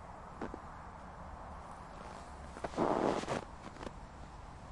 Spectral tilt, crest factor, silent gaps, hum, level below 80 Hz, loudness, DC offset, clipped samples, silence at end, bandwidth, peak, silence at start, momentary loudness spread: -6 dB/octave; 22 dB; none; none; -54 dBFS; -42 LUFS; under 0.1%; under 0.1%; 0 s; 11.5 kHz; -18 dBFS; 0 s; 17 LU